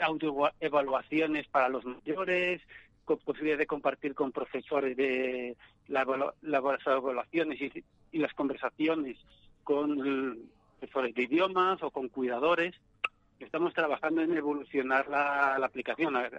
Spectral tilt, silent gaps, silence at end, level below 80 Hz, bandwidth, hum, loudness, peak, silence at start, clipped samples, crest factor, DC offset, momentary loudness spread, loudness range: -6.5 dB/octave; none; 0 s; -68 dBFS; 8.2 kHz; none; -31 LUFS; -14 dBFS; 0 s; under 0.1%; 18 dB; under 0.1%; 10 LU; 3 LU